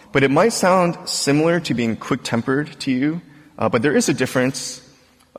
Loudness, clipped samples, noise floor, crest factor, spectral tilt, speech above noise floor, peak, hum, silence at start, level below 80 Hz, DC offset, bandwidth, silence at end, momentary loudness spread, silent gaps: -19 LUFS; under 0.1%; -52 dBFS; 16 dB; -4.5 dB/octave; 33 dB; -4 dBFS; none; 0.15 s; -54 dBFS; under 0.1%; 16 kHz; 0.6 s; 8 LU; none